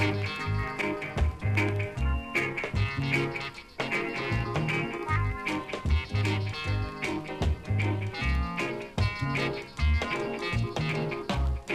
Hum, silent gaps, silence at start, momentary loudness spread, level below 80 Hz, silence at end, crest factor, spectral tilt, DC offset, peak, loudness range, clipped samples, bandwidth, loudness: none; none; 0 s; 4 LU; -36 dBFS; 0 s; 16 dB; -6 dB/octave; under 0.1%; -12 dBFS; 1 LU; under 0.1%; 13 kHz; -30 LUFS